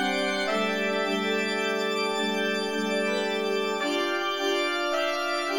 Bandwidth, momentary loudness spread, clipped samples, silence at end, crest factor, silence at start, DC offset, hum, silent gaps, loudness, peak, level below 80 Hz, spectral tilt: 19 kHz; 1 LU; under 0.1%; 0 s; 12 dB; 0 s; under 0.1%; none; none; -26 LUFS; -14 dBFS; -74 dBFS; -3.5 dB/octave